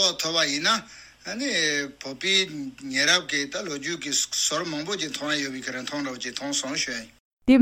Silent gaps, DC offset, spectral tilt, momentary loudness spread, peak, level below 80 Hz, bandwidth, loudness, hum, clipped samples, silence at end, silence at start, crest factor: 7.20-7.37 s; under 0.1%; -1.5 dB/octave; 10 LU; -6 dBFS; -60 dBFS; 16 kHz; -25 LUFS; none; under 0.1%; 0 s; 0 s; 20 dB